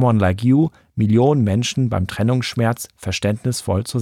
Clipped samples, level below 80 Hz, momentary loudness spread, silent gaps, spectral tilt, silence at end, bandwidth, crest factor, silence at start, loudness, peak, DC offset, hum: under 0.1%; -46 dBFS; 7 LU; none; -6.5 dB/octave; 0 s; 15.5 kHz; 14 dB; 0 s; -19 LUFS; -4 dBFS; under 0.1%; none